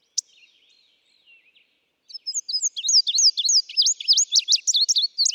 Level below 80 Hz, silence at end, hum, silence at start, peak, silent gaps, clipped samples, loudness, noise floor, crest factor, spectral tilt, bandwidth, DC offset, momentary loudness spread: under -90 dBFS; 0 s; none; 0.15 s; -8 dBFS; none; under 0.1%; -18 LUFS; -66 dBFS; 16 dB; 9 dB/octave; over 20 kHz; under 0.1%; 13 LU